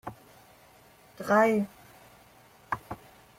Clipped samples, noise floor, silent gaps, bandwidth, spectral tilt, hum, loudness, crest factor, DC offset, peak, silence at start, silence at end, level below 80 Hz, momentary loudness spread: under 0.1%; -57 dBFS; none; 16.5 kHz; -6 dB/octave; 60 Hz at -65 dBFS; -28 LUFS; 20 dB; under 0.1%; -12 dBFS; 0.05 s; 0.45 s; -66 dBFS; 22 LU